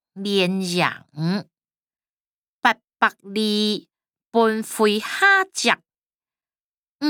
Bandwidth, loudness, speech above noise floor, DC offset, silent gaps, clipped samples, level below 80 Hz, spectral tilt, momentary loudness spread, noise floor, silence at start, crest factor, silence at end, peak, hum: 19.5 kHz; -21 LUFS; over 69 dB; under 0.1%; 2.09-2.42 s, 2.48-2.60 s, 2.84-2.88 s, 5.98-6.19 s, 6.60-6.72 s, 6.78-6.99 s; under 0.1%; -74 dBFS; -4 dB/octave; 9 LU; under -90 dBFS; 0.15 s; 20 dB; 0 s; -2 dBFS; none